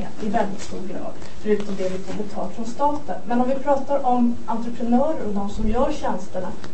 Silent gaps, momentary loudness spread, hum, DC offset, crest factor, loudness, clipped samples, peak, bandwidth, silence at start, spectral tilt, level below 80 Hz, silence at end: none; 11 LU; none; 10%; 16 dB; -24 LUFS; under 0.1%; -6 dBFS; 8.8 kHz; 0 s; -6.5 dB/octave; -38 dBFS; 0 s